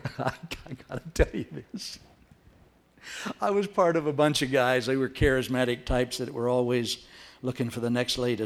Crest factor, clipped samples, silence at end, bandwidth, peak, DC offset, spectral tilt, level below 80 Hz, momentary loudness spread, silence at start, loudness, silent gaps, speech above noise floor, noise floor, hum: 20 dB; under 0.1%; 0 s; 16 kHz; -8 dBFS; under 0.1%; -5 dB/octave; -42 dBFS; 15 LU; 0.05 s; -27 LUFS; none; 32 dB; -59 dBFS; none